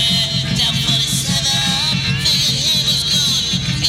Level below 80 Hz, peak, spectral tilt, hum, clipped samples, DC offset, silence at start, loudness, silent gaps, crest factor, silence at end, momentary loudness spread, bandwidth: -36 dBFS; -2 dBFS; -2.5 dB/octave; none; under 0.1%; under 0.1%; 0 s; -14 LUFS; none; 14 dB; 0 s; 2 LU; 16.5 kHz